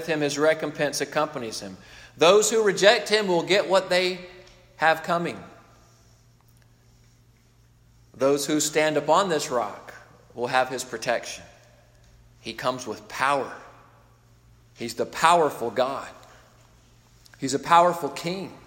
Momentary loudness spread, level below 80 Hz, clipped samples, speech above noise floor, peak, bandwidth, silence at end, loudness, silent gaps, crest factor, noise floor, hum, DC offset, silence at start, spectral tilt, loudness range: 18 LU; -62 dBFS; under 0.1%; 34 dB; -2 dBFS; 16.5 kHz; 0.1 s; -23 LUFS; none; 22 dB; -58 dBFS; none; under 0.1%; 0 s; -3 dB/octave; 10 LU